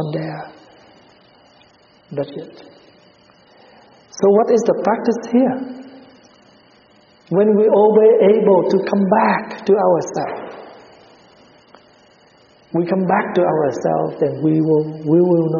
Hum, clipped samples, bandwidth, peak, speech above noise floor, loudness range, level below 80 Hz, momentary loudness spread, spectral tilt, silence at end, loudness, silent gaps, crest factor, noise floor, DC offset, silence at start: none; under 0.1%; 7.2 kHz; -2 dBFS; 36 dB; 14 LU; -64 dBFS; 19 LU; -7 dB/octave; 0 s; -16 LUFS; none; 16 dB; -51 dBFS; under 0.1%; 0 s